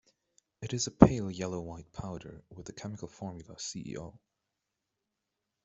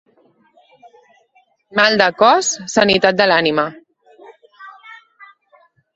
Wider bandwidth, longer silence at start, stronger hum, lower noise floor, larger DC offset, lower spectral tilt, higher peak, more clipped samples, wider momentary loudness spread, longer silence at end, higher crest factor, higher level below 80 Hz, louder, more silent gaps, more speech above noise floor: about the same, 8.2 kHz vs 8.2 kHz; second, 0.6 s vs 1.75 s; neither; first, -86 dBFS vs -58 dBFS; neither; first, -6 dB/octave vs -2.5 dB/octave; second, -4 dBFS vs 0 dBFS; neither; first, 23 LU vs 10 LU; first, 1.45 s vs 1.05 s; first, 30 dB vs 18 dB; first, -50 dBFS vs -58 dBFS; second, -31 LUFS vs -14 LUFS; neither; first, 54 dB vs 44 dB